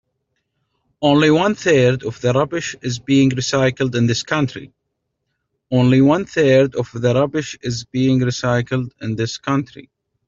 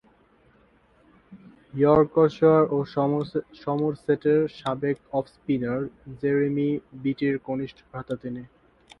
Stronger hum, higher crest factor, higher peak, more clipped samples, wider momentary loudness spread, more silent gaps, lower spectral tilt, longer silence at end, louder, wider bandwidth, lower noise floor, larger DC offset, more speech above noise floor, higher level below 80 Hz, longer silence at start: neither; about the same, 16 dB vs 20 dB; first, -2 dBFS vs -6 dBFS; neither; second, 10 LU vs 14 LU; neither; second, -6 dB/octave vs -9 dB/octave; about the same, 0.45 s vs 0.55 s; first, -17 LUFS vs -25 LUFS; first, 7.6 kHz vs 6.4 kHz; first, -75 dBFS vs -60 dBFS; neither; first, 58 dB vs 36 dB; first, -52 dBFS vs -58 dBFS; second, 1 s vs 1.3 s